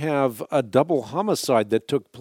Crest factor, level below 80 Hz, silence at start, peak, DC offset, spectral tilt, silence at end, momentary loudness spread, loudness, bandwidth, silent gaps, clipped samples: 18 dB; -70 dBFS; 0 s; -4 dBFS; under 0.1%; -5.5 dB/octave; 0 s; 4 LU; -23 LUFS; 17.5 kHz; none; under 0.1%